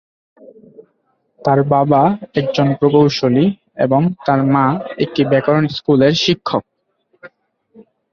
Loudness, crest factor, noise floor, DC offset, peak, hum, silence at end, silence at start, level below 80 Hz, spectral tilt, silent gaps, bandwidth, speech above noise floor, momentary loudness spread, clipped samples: -15 LUFS; 14 dB; -64 dBFS; under 0.1%; -2 dBFS; none; 0.3 s; 0.8 s; -54 dBFS; -7 dB/octave; none; 7.2 kHz; 50 dB; 8 LU; under 0.1%